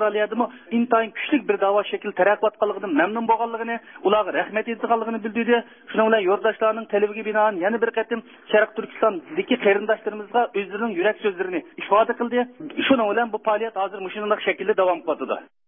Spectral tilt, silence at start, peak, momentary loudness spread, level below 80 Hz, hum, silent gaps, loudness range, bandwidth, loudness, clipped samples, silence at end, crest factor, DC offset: -9.5 dB/octave; 0 s; -4 dBFS; 7 LU; -72 dBFS; none; none; 1 LU; 3.7 kHz; -22 LUFS; under 0.1%; 0.25 s; 18 dB; under 0.1%